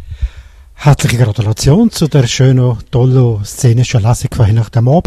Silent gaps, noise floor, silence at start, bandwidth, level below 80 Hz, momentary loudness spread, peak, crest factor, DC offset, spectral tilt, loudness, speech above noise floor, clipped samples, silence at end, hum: none; -35 dBFS; 0 s; 13.5 kHz; -28 dBFS; 4 LU; 0 dBFS; 10 dB; under 0.1%; -6.5 dB/octave; -11 LUFS; 25 dB; 0.1%; 0.05 s; none